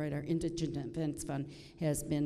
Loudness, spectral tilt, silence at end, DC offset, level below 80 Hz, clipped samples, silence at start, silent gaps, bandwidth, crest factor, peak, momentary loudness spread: -37 LUFS; -6 dB/octave; 0 s; under 0.1%; -56 dBFS; under 0.1%; 0 s; none; 14 kHz; 14 dB; -22 dBFS; 5 LU